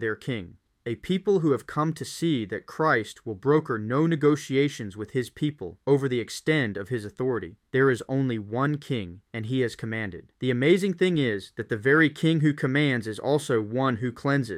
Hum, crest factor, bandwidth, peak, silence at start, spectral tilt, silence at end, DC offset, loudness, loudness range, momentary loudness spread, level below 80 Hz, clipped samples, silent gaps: none; 18 dB; 15 kHz; -8 dBFS; 0 s; -6.5 dB/octave; 0 s; under 0.1%; -26 LUFS; 4 LU; 11 LU; -62 dBFS; under 0.1%; none